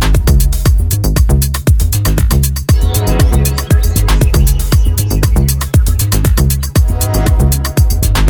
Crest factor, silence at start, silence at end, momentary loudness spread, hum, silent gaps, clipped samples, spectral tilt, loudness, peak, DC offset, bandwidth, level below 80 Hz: 10 dB; 0 s; 0 s; 2 LU; none; none; under 0.1%; -5 dB/octave; -12 LUFS; 0 dBFS; under 0.1%; over 20 kHz; -12 dBFS